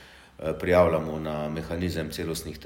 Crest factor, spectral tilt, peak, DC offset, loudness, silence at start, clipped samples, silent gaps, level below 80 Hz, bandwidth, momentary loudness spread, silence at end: 20 dB; -6 dB/octave; -8 dBFS; under 0.1%; -27 LUFS; 0 s; under 0.1%; none; -50 dBFS; 16.5 kHz; 11 LU; 0 s